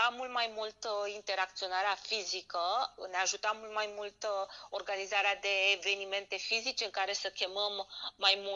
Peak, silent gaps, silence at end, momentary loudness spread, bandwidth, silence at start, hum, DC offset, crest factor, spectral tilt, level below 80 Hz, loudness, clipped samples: -14 dBFS; none; 0 s; 9 LU; 8 kHz; 0 s; none; under 0.1%; 22 dB; 1 dB/octave; -76 dBFS; -34 LUFS; under 0.1%